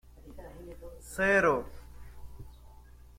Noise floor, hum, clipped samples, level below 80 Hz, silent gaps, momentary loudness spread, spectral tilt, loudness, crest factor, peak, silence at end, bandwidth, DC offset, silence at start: -52 dBFS; 60 Hz at -50 dBFS; under 0.1%; -50 dBFS; none; 27 LU; -5 dB/octave; -28 LUFS; 20 dB; -14 dBFS; 0.5 s; 16.5 kHz; under 0.1%; 0.25 s